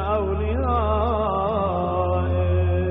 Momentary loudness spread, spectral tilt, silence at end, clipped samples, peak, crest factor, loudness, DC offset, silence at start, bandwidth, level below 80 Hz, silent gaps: 2 LU; -7.5 dB/octave; 0 s; under 0.1%; -10 dBFS; 12 dB; -22 LUFS; under 0.1%; 0 s; 3.9 kHz; -32 dBFS; none